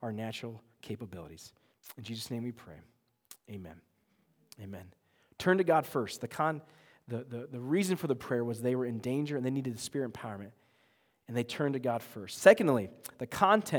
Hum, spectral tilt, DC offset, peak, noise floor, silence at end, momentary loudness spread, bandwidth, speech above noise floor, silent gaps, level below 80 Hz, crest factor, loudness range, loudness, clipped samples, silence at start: none; -5.5 dB/octave; under 0.1%; -6 dBFS; -72 dBFS; 0 s; 21 LU; over 20 kHz; 40 dB; none; -72 dBFS; 28 dB; 14 LU; -32 LUFS; under 0.1%; 0 s